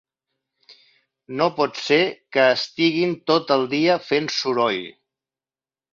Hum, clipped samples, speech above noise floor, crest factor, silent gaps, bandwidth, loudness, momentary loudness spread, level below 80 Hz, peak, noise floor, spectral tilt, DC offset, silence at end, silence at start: none; under 0.1%; over 70 dB; 18 dB; none; 7.4 kHz; -20 LUFS; 5 LU; -66 dBFS; -4 dBFS; under -90 dBFS; -4.5 dB/octave; under 0.1%; 1 s; 1.3 s